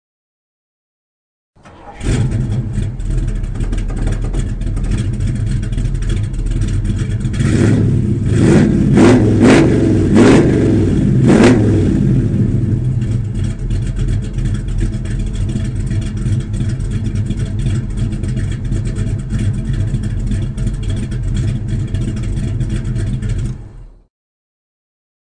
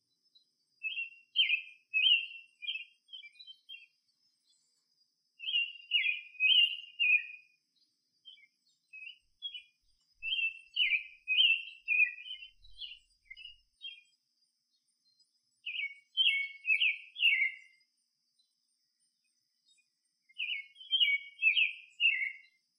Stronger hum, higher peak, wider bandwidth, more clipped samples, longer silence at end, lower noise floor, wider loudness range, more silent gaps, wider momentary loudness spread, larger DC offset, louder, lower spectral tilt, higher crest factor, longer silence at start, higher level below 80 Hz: neither; first, -2 dBFS vs -16 dBFS; second, 9.8 kHz vs 12 kHz; neither; first, 1.4 s vs 0.4 s; second, -34 dBFS vs -80 dBFS; second, 10 LU vs 15 LU; neither; second, 12 LU vs 23 LU; neither; first, -15 LUFS vs -29 LUFS; first, -7.5 dB/octave vs 4.5 dB/octave; second, 14 dB vs 20 dB; first, 1.65 s vs 0.85 s; first, -22 dBFS vs -80 dBFS